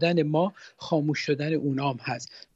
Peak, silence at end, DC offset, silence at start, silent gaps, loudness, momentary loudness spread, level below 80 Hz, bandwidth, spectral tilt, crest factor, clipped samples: -10 dBFS; 0.15 s; under 0.1%; 0 s; none; -27 LUFS; 9 LU; -70 dBFS; 8 kHz; -6.5 dB/octave; 16 dB; under 0.1%